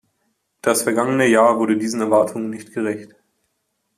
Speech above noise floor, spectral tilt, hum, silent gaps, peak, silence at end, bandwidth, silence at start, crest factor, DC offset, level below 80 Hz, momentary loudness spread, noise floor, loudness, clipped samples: 54 dB; -4.5 dB/octave; none; none; -2 dBFS; 0.9 s; 14.5 kHz; 0.65 s; 16 dB; under 0.1%; -66 dBFS; 12 LU; -72 dBFS; -18 LUFS; under 0.1%